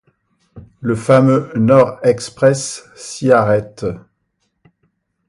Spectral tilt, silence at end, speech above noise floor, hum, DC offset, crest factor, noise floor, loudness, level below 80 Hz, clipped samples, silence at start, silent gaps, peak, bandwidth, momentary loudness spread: -6.5 dB/octave; 1.3 s; 54 dB; none; under 0.1%; 16 dB; -68 dBFS; -15 LUFS; -50 dBFS; under 0.1%; 0.55 s; none; 0 dBFS; 11.5 kHz; 14 LU